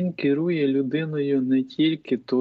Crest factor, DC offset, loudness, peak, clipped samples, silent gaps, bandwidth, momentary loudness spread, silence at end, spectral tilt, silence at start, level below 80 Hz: 12 dB; under 0.1%; -23 LUFS; -12 dBFS; under 0.1%; none; 5 kHz; 4 LU; 0 s; -9 dB/octave; 0 s; -72 dBFS